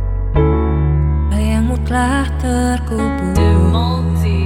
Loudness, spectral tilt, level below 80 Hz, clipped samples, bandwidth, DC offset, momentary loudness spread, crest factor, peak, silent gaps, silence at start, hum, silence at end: -16 LUFS; -7 dB/octave; -20 dBFS; under 0.1%; 12.5 kHz; under 0.1%; 4 LU; 12 dB; -2 dBFS; none; 0 s; none; 0 s